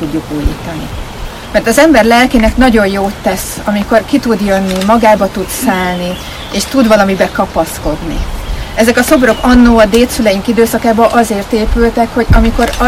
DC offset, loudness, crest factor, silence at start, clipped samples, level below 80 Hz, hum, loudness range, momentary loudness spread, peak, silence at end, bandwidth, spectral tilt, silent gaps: under 0.1%; -10 LUFS; 10 dB; 0 s; 1%; -20 dBFS; none; 3 LU; 13 LU; 0 dBFS; 0 s; 16.5 kHz; -5 dB/octave; none